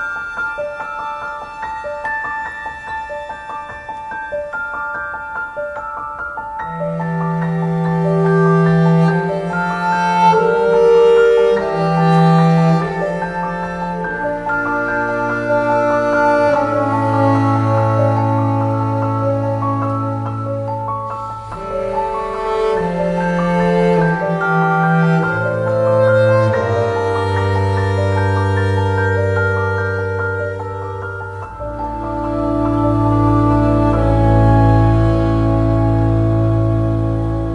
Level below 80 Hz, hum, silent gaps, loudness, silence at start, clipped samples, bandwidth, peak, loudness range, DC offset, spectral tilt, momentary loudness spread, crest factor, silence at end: -30 dBFS; none; none; -16 LUFS; 0 s; under 0.1%; 10.5 kHz; -2 dBFS; 11 LU; under 0.1%; -8.5 dB/octave; 13 LU; 14 dB; 0 s